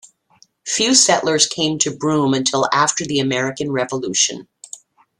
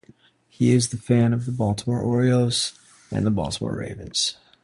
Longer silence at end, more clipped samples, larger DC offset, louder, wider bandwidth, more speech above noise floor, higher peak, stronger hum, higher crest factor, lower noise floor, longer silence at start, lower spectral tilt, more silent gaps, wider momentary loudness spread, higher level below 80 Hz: first, 0.45 s vs 0.3 s; neither; neither; first, -16 LUFS vs -23 LUFS; about the same, 12.5 kHz vs 11.5 kHz; first, 38 dB vs 33 dB; first, 0 dBFS vs -6 dBFS; neither; about the same, 18 dB vs 16 dB; about the same, -55 dBFS vs -55 dBFS; about the same, 0.65 s vs 0.6 s; second, -2.5 dB/octave vs -5.5 dB/octave; neither; first, 21 LU vs 9 LU; second, -60 dBFS vs -48 dBFS